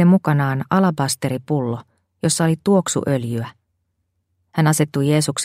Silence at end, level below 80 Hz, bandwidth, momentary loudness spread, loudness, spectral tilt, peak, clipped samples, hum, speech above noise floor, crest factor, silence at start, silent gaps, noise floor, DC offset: 0 s; -58 dBFS; 16 kHz; 10 LU; -19 LUFS; -5.5 dB/octave; -2 dBFS; under 0.1%; none; 53 dB; 16 dB; 0 s; none; -71 dBFS; under 0.1%